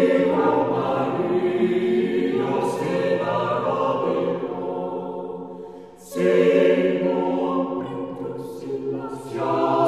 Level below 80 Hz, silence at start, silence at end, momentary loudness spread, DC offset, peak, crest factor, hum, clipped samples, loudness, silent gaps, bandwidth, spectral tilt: -64 dBFS; 0 s; 0 s; 13 LU; 0.1%; -6 dBFS; 16 dB; none; under 0.1%; -22 LUFS; none; 13 kHz; -7 dB/octave